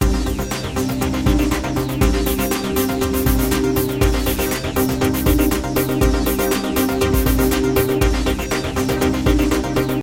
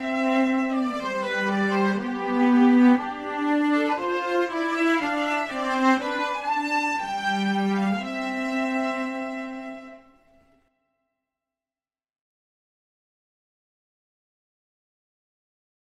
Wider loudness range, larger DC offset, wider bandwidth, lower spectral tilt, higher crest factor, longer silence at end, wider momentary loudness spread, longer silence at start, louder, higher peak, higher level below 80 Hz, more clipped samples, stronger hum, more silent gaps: second, 1 LU vs 10 LU; neither; first, 17 kHz vs 11.5 kHz; about the same, -5.5 dB/octave vs -5.5 dB/octave; about the same, 16 dB vs 18 dB; second, 0 s vs 5.95 s; second, 4 LU vs 9 LU; about the same, 0 s vs 0 s; first, -18 LUFS vs -24 LUFS; first, -2 dBFS vs -8 dBFS; first, -24 dBFS vs -66 dBFS; neither; neither; neither